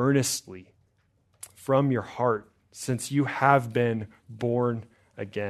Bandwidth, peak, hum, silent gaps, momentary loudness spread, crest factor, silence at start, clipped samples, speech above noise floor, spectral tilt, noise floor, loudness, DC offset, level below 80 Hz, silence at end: 13.5 kHz; -4 dBFS; none; none; 22 LU; 24 dB; 0 s; under 0.1%; 42 dB; -5.5 dB/octave; -68 dBFS; -26 LUFS; under 0.1%; -68 dBFS; 0 s